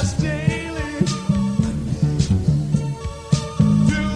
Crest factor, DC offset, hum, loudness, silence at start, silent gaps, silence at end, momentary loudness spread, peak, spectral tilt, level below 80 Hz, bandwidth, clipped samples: 16 dB; under 0.1%; none; -21 LUFS; 0 s; none; 0 s; 7 LU; -4 dBFS; -6.5 dB/octave; -34 dBFS; 11 kHz; under 0.1%